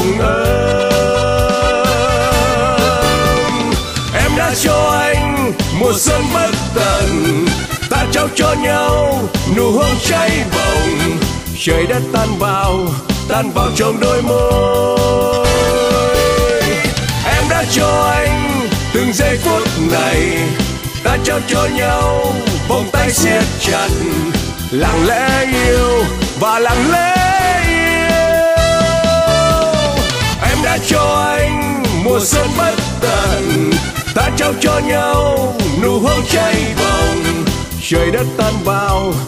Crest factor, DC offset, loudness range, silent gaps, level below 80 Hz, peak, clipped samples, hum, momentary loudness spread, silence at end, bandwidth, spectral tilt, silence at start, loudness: 12 dB; under 0.1%; 2 LU; none; -24 dBFS; 0 dBFS; under 0.1%; none; 4 LU; 0 s; 15.5 kHz; -4.5 dB/octave; 0 s; -13 LUFS